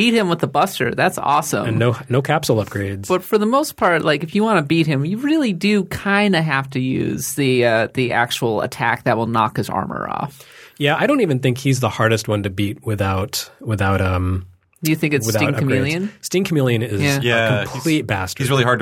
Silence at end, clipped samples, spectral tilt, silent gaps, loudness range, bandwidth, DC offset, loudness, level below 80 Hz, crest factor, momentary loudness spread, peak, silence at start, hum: 0 s; under 0.1%; -5.5 dB/octave; none; 2 LU; 17.5 kHz; under 0.1%; -18 LUFS; -50 dBFS; 18 dB; 7 LU; -2 dBFS; 0 s; none